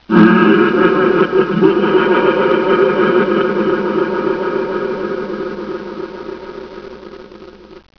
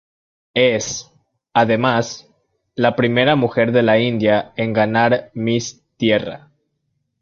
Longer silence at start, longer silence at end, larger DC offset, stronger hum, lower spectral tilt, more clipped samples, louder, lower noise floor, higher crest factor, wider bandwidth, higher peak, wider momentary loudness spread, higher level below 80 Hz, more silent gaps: second, 0.1 s vs 0.55 s; second, 0.2 s vs 0.85 s; neither; neither; first, -8.5 dB/octave vs -5 dB/octave; neither; first, -13 LUFS vs -17 LUFS; second, -36 dBFS vs -71 dBFS; about the same, 14 dB vs 16 dB; second, 5.4 kHz vs 7.6 kHz; about the same, 0 dBFS vs -2 dBFS; first, 19 LU vs 13 LU; first, -48 dBFS vs -54 dBFS; neither